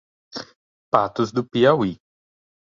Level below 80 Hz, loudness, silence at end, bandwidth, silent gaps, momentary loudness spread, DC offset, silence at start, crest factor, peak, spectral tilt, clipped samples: -58 dBFS; -20 LUFS; 0.85 s; 7.4 kHz; 0.56-0.92 s; 18 LU; under 0.1%; 0.35 s; 22 dB; -2 dBFS; -6.5 dB/octave; under 0.1%